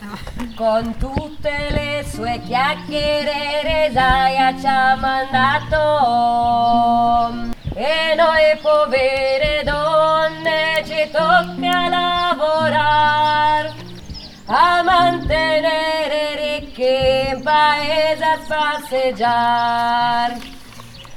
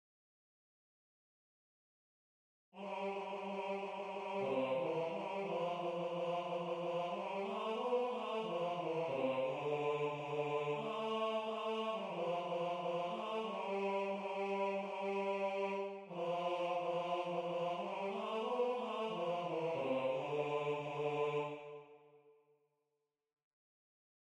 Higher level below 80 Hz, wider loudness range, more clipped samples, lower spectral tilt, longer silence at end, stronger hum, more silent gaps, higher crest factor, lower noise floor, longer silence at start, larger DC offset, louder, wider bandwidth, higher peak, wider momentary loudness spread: first, -36 dBFS vs -86 dBFS; second, 2 LU vs 6 LU; neither; second, -4.5 dB/octave vs -6 dB/octave; second, 0 s vs 2.05 s; neither; neither; about the same, 16 dB vs 14 dB; second, -37 dBFS vs -88 dBFS; second, 0 s vs 2.75 s; neither; first, -17 LUFS vs -40 LUFS; first, 16.5 kHz vs 10 kHz; first, -2 dBFS vs -26 dBFS; first, 9 LU vs 5 LU